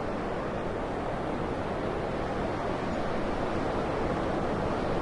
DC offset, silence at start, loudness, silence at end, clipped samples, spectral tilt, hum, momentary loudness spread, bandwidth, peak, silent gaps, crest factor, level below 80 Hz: under 0.1%; 0 s; -31 LUFS; 0 s; under 0.1%; -7 dB/octave; none; 3 LU; 11.5 kHz; -18 dBFS; none; 12 dB; -42 dBFS